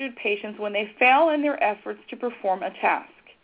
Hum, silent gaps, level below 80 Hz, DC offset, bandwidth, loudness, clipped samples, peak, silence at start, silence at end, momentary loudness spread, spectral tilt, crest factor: none; none; -72 dBFS; under 0.1%; 4 kHz; -23 LUFS; under 0.1%; -8 dBFS; 0 s; 0.35 s; 14 LU; -7.5 dB/octave; 18 dB